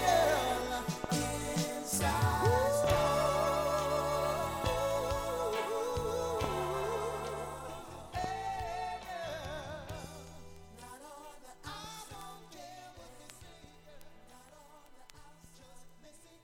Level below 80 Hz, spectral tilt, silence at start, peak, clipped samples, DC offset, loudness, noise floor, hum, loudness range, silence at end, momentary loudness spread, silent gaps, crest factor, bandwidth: -50 dBFS; -4.5 dB/octave; 0 s; -16 dBFS; under 0.1%; under 0.1%; -34 LUFS; -57 dBFS; none; 18 LU; 0.05 s; 22 LU; none; 20 dB; 17 kHz